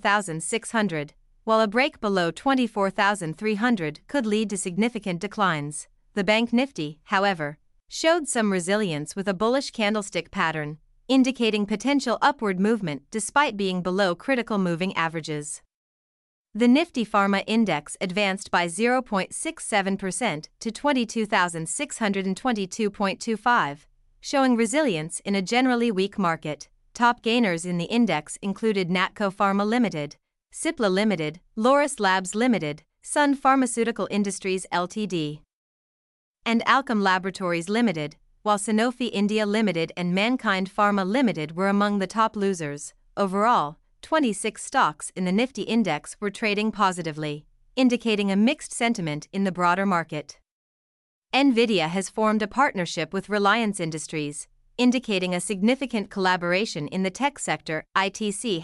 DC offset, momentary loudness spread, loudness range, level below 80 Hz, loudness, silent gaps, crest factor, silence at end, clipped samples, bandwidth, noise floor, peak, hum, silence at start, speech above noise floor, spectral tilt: under 0.1%; 9 LU; 2 LU; -60 dBFS; -24 LUFS; 15.74-16.45 s, 35.53-36.34 s, 50.51-51.22 s; 20 dB; 0 s; under 0.1%; 12 kHz; under -90 dBFS; -6 dBFS; none; 0.05 s; over 66 dB; -4.5 dB/octave